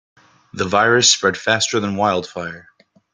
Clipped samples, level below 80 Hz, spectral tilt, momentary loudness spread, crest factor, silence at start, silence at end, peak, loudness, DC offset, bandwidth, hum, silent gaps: under 0.1%; -60 dBFS; -2.5 dB/octave; 17 LU; 18 dB; 0.55 s; 0.5 s; 0 dBFS; -16 LUFS; under 0.1%; 10.5 kHz; none; none